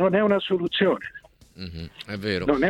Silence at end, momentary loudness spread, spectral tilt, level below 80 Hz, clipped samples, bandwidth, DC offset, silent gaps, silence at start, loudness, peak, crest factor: 0 s; 17 LU; -7 dB/octave; -52 dBFS; under 0.1%; 12.5 kHz; under 0.1%; none; 0 s; -24 LUFS; -8 dBFS; 16 dB